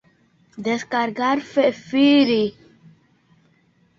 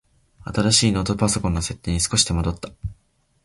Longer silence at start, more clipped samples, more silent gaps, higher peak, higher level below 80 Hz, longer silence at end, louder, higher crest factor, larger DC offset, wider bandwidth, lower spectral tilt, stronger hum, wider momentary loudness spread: about the same, 0.55 s vs 0.45 s; neither; neither; second, -6 dBFS vs -2 dBFS; second, -64 dBFS vs -36 dBFS; first, 1.5 s vs 0.5 s; about the same, -20 LUFS vs -20 LUFS; about the same, 16 dB vs 20 dB; neither; second, 7.4 kHz vs 11.5 kHz; about the same, -5 dB/octave vs -4 dB/octave; neither; second, 10 LU vs 18 LU